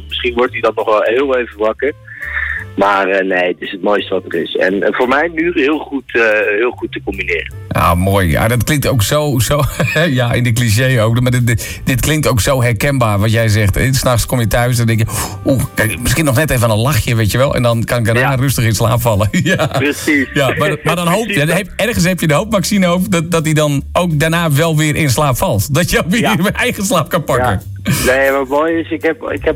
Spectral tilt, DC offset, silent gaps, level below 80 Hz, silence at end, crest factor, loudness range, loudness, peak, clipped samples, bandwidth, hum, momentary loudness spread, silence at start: -5 dB/octave; under 0.1%; none; -32 dBFS; 0 s; 12 dB; 2 LU; -13 LUFS; -2 dBFS; under 0.1%; 16.5 kHz; none; 5 LU; 0 s